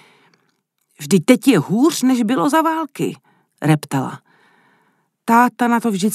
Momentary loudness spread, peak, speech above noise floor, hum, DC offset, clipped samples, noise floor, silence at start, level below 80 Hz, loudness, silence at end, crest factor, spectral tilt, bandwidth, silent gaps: 12 LU; 0 dBFS; 51 dB; none; under 0.1%; under 0.1%; -67 dBFS; 1 s; -70 dBFS; -16 LUFS; 0 s; 18 dB; -5.5 dB/octave; 14.5 kHz; none